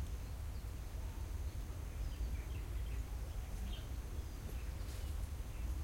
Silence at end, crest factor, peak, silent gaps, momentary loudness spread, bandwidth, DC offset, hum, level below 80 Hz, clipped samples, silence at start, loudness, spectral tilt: 0 s; 12 dB; -32 dBFS; none; 3 LU; 16.5 kHz; under 0.1%; none; -44 dBFS; under 0.1%; 0 s; -46 LUFS; -5.5 dB/octave